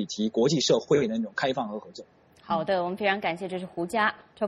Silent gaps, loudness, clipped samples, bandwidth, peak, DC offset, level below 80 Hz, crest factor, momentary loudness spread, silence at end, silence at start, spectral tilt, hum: none; -27 LUFS; under 0.1%; 12.5 kHz; -10 dBFS; under 0.1%; -66 dBFS; 18 dB; 11 LU; 0 s; 0 s; -4.5 dB/octave; none